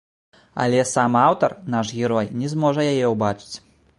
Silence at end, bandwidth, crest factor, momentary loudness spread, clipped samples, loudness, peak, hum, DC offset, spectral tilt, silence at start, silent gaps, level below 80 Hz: 0.4 s; 11.5 kHz; 18 dB; 13 LU; under 0.1%; -20 LUFS; -4 dBFS; none; under 0.1%; -5.5 dB/octave; 0.55 s; none; -58 dBFS